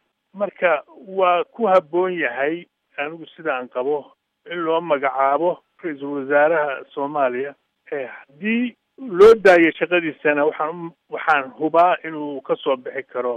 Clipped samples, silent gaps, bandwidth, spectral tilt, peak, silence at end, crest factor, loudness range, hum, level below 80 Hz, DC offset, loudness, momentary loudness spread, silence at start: under 0.1%; none; 9.4 kHz; -6 dB/octave; -2 dBFS; 0 s; 18 dB; 6 LU; none; -62 dBFS; under 0.1%; -20 LUFS; 14 LU; 0.35 s